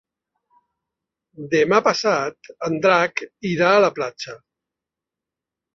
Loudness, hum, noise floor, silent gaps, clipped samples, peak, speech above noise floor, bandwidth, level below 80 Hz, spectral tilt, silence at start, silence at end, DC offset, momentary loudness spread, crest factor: -19 LUFS; none; -87 dBFS; none; under 0.1%; -2 dBFS; 67 dB; 7.4 kHz; -66 dBFS; -4.5 dB/octave; 1.4 s; 1.4 s; under 0.1%; 14 LU; 20 dB